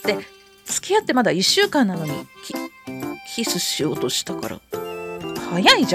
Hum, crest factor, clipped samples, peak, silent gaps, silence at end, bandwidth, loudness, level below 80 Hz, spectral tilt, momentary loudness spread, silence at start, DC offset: none; 20 dB; under 0.1%; -2 dBFS; none; 0 s; 16.5 kHz; -21 LUFS; -60 dBFS; -3 dB/octave; 15 LU; 0 s; under 0.1%